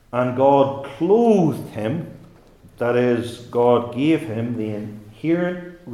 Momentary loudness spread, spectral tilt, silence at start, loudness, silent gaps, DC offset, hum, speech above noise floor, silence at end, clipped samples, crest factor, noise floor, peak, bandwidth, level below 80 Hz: 13 LU; -8 dB/octave; 0.15 s; -20 LUFS; none; under 0.1%; none; 29 dB; 0 s; under 0.1%; 18 dB; -48 dBFS; -2 dBFS; 13.5 kHz; -56 dBFS